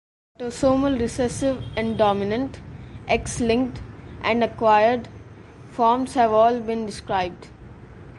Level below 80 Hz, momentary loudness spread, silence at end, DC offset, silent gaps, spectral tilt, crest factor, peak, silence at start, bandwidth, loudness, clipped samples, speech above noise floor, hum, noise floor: -44 dBFS; 19 LU; 0 s; under 0.1%; none; -5.5 dB/octave; 16 dB; -6 dBFS; 0.4 s; 11.5 kHz; -22 LUFS; under 0.1%; 22 dB; none; -43 dBFS